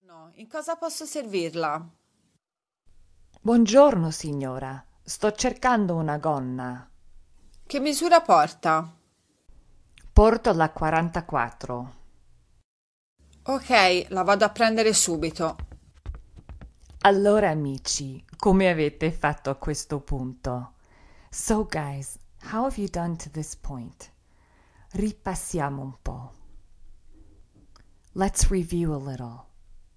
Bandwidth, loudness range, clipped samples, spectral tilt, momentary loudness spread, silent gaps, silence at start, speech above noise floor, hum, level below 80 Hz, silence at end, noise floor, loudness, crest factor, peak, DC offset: 11 kHz; 10 LU; under 0.1%; -4.5 dB/octave; 19 LU; 12.64-13.16 s; 0.15 s; 63 dB; none; -38 dBFS; 0.25 s; -87 dBFS; -24 LUFS; 24 dB; -2 dBFS; under 0.1%